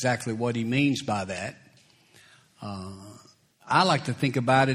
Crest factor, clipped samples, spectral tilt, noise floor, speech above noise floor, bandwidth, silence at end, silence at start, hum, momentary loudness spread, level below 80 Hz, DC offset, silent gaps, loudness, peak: 22 dB; under 0.1%; -5.5 dB/octave; -59 dBFS; 33 dB; 14 kHz; 0 s; 0 s; none; 17 LU; -64 dBFS; under 0.1%; none; -26 LUFS; -6 dBFS